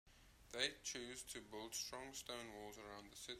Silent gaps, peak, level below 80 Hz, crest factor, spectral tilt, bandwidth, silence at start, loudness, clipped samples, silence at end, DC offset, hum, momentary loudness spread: none; -24 dBFS; -72 dBFS; 28 dB; -1 dB/octave; 16 kHz; 0.05 s; -48 LUFS; under 0.1%; 0 s; under 0.1%; none; 12 LU